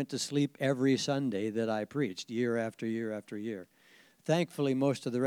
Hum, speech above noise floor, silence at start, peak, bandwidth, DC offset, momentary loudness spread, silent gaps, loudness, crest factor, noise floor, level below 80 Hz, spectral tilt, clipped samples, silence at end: none; 30 dB; 0 s; -14 dBFS; 16 kHz; under 0.1%; 10 LU; none; -32 LUFS; 18 dB; -62 dBFS; -86 dBFS; -5.5 dB/octave; under 0.1%; 0 s